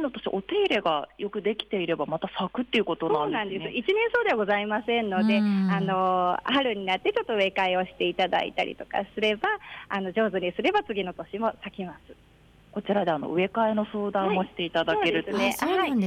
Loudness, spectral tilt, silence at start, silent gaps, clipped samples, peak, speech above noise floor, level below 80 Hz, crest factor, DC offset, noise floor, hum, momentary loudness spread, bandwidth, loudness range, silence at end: -26 LUFS; -5.5 dB/octave; 0 s; none; under 0.1%; -14 dBFS; 30 dB; -60 dBFS; 14 dB; under 0.1%; -56 dBFS; none; 7 LU; 15.5 kHz; 5 LU; 0 s